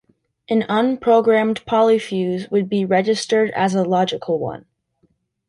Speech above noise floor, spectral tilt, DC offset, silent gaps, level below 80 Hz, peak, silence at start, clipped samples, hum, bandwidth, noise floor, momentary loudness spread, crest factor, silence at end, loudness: 46 dB; -5.5 dB/octave; under 0.1%; none; -60 dBFS; -4 dBFS; 0.5 s; under 0.1%; none; 11.5 kHz; -64 dBFS; 7 LU; 16 dB; 0.9 s; -18 LUFS